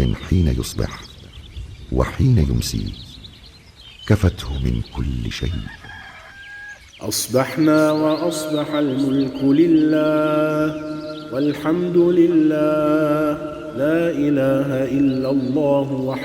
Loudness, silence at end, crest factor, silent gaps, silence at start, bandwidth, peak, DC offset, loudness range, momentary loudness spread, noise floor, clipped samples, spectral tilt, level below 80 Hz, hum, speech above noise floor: -19 LUFS; 0 s; 16 dB; none; 0 s; 20 kHz; -4 dBFS; under 0.1%; 7 LU; 20 LU; -44 dBFS; under 0.1%; -6.5 dB/octave; -34 dBFS; none; 26 dB